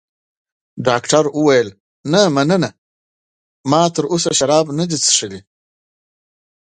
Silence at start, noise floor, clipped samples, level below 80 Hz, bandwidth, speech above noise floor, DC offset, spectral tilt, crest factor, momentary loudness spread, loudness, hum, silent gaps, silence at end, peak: 0.75 s; under -90 dBFS; under 0.1%; -58 dBFS; 9.6 kHz; over 75 dB; under 0.1%; -4 dB/octave; 18 dB; 12 LU; -15 LUFS; none; 1.80-2.04 s, 2.78-3.64 s; 1.3 s; 0 dBFS